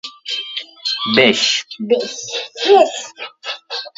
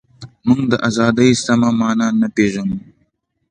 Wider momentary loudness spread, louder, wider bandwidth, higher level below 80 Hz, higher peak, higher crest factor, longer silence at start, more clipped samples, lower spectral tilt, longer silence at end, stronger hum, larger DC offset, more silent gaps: first, 15 LU vs 10 LU; about the same, -16 LUFS vs -16 LUFS; second, 8 kHz vs 10 kHz; second, -64 dBFS vs -50 dBFS; about the same, 0 dBFS vs 0 dBFS; about the same, 18 dB vs 16 dB; second, 0.05 s vs 0.2 s; neither; second, -2.5 dB/octave vs -5.5 dB/octave; second, 0.1 s vs 0.7 s; neither; neither; neither